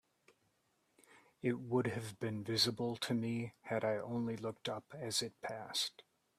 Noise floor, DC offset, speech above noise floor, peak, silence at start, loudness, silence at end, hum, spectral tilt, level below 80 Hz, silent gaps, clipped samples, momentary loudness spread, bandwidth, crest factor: -79 dBFS; under 0.1%; 40 dB; -20 dBFS; 1.1 s; -39 LUFS; 0.4 s; none; -4.5 dB/octave; -78 dBFS; none; under 0.1%; 9 LU; 15 kHz; 20 dB